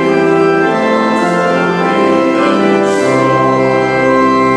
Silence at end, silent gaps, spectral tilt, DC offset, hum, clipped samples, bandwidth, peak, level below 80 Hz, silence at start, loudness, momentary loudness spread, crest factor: 0 s; none; -6 dB/octave; under 0.1%; none; under 0.1%; 11.5 kHz; 0 dBFS; -46 dBFS; 0 s; -11 LUFS; 2 LU; 10 dB